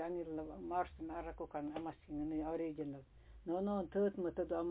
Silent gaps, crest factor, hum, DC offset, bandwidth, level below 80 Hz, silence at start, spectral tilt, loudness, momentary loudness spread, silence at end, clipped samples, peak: none; 16 dB; none; under 0.1%; 4 kHz; -60 dBFS; 0 s; -7 dB/octave; -42 LUFS; 9 LU; 0 s; under 0.1%; -24 dBFS